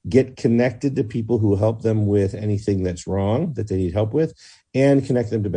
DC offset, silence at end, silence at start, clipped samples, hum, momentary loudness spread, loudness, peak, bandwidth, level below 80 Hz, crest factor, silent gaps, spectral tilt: under 0.1%; 0 s; 0.05 s; under 0.1%; none; 6 LU; -21 LUFS; -2 dBFS; 9.6 kHz; -52 dBFS; 18 dB; none; -8 dB/octave